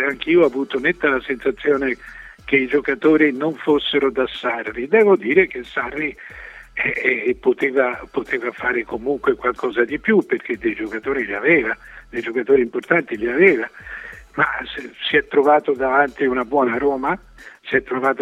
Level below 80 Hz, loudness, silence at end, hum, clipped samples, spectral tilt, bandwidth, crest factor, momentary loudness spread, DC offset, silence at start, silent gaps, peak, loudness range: -50 dBFS; -19 LUFS; 0 s; none; under 0.1%; -6.5 dB/octave; 7.8 kHz; 18 dB; 12 LU; under 0.1%; 0 s; none; 0 dBFS; 3 LU